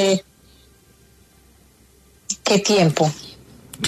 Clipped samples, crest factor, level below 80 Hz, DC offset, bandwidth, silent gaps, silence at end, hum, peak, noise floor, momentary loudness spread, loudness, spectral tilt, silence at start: under 0.1%; 20 dB; -56 dBFS; under 0.1%; 13.5 kHz; none; 0 s; none; -4 dBFS; -53 dBFS; 22 LU; -19 LUFS; -4.5 dB/octave; 0 s